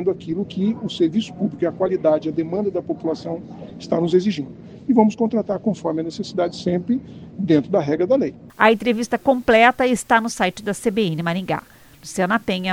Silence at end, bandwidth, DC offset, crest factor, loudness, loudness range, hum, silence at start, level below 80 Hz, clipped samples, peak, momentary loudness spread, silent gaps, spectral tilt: 0 s; 16 kHz; under 0.1%; 20 dB; -20 LUFS; 4 LU; none; 0 s; -54 dBFS; under 0.1%; 0 dBFS; 11 LU; none; -5.5 dB/octave